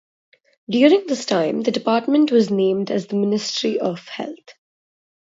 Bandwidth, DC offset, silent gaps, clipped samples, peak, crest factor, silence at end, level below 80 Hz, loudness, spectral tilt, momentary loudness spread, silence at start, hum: 7.8 kHz; under 0.1%; none; under 0.1%; -2 dBFS; 18 dB; 0.8 s; -70 dBFS; -19 LUFS; -5 dB/octave; 11 LU; 0.7 s; none